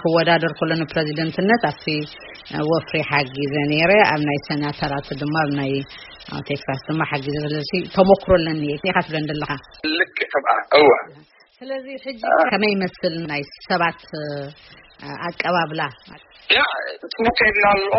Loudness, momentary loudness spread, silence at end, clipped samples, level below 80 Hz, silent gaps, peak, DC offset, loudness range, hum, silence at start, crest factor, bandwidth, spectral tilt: -20 LUFS; 15 LU; 0 s; under 0.1%; -46 dBFS; none; 0 dBFS; under 0.1%; 5 LU; none; 0 s; 20 dB; 6 kHz; -3 dB/octave